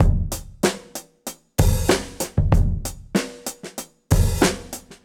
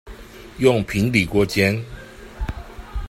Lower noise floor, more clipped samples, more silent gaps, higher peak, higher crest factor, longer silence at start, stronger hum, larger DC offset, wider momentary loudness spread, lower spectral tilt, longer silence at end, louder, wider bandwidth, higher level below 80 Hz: about the same, -39 dBFS vs -39 dBFS; neither; neither; about the same, -2 dBFS vs -2 dBFS; about the same, 20 dB vs 20 dB; about the same, 0 s vs 0.05 s; neither; neither; second, 15 LU vs 22 LU; about the same, -5 dB/octave vs -6 dB/octave; about the same, 0.1 s vs 0 s; second, -22 LUFS vs -19 LUFS; first, 18.5 kHz vs 16 kHz; first, -26 dBFS vs -36 dBFS